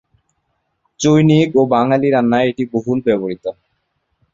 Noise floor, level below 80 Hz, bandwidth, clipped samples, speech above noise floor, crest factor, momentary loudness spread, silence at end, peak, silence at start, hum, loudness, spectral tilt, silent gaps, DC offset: -69 dBFS; -54 dBFS; 7.6 kHz; under 0.1%; 55 dB; 16 dB; 10 LU; 0.8 s; 0 dBFS; 1 s; none; -15 LUFS; -6.5 dB/octave; none; under 0.1%